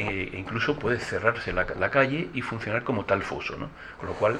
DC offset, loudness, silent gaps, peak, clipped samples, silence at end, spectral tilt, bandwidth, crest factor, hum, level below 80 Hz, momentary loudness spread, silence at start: under 0.1%; -27 LUFS; none; -6 dBFS; under 0.1%; 0 s; -6 dB/octave; 10.5 kHz; 22 dB; none; -48 dBFS; 11 LU; 0 s